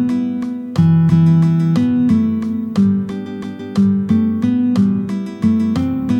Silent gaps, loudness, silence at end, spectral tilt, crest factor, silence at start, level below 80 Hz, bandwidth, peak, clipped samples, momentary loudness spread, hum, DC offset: none; -15 LUFS; 0 s; -9 dB/octave; 12 dB; 0 s; -48 dBFS; 8.2 kHz; -2 dBFS; under 0.1%; 10 LU; none; under 0.1%